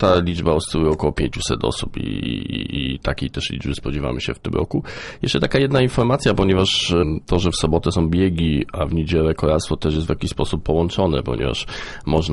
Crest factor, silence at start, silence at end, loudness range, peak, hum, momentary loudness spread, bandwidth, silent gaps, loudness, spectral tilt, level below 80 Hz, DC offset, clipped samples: 18 dB; 0 s; 0 s; 6 LU; -2 dBFS; none; 8 LU; 11.5 kHz; none; -20 LUFS; -5.5 dB/octave; -32 dBFS; under 0.1%; under 0.1%